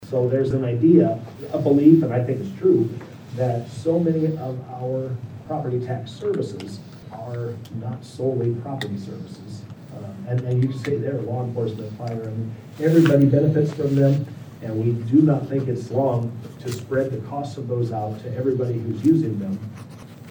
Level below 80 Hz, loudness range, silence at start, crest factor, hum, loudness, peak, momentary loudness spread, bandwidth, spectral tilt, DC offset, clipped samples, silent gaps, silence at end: -60 dBFS; 10 LU; 0 s; 20 dB; none; -22 LUFS; -2 dBFS; 19 LU; over 20 kHz; -9 dB/octave; under 0.1%; under 0.1%; none; 0 s